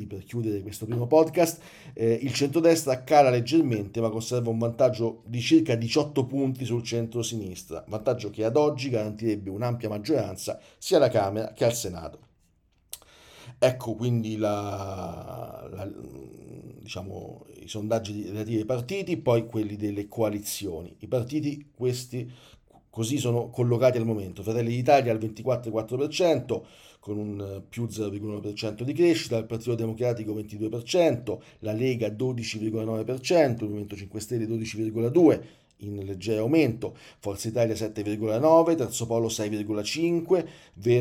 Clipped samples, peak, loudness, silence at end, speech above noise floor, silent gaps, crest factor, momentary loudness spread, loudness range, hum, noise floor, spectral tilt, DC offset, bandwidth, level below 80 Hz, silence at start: under 0.1%; -6 dBFS; -27 LUFS; 0 s; 39 dB; none; 20 dB; 16 LU; 7 LU; none; -66 dBFS; -6 dB/octave; under 0.1%; 16.5 kHz; -62 dBFS; 0 s